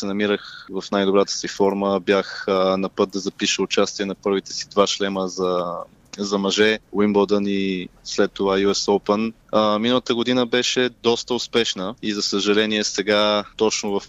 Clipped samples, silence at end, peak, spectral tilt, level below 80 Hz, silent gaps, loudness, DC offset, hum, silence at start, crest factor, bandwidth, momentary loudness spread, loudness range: under 0.1%; 0 s; -4 dBFS; -3.5 dB/octave; -56 dBFS; none; -21 LUFS; under 0.1%; none; 0 s; 16 dB; 8.6 kHz; 6 LU; 2 LU